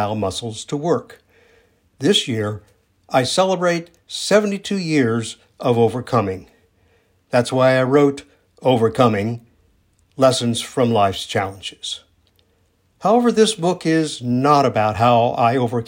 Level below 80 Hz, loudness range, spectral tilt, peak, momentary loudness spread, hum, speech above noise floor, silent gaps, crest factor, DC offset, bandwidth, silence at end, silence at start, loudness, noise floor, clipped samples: -60 dBFS; 3 LU; -5 dB/octave; 0 dBFS; 12 LU; none; 44 dB; none; 18 dB; under 0.1%; 16.5 kHz; 0 s; 0 s; -18 LUFS; -61 dBFS; under 0.1%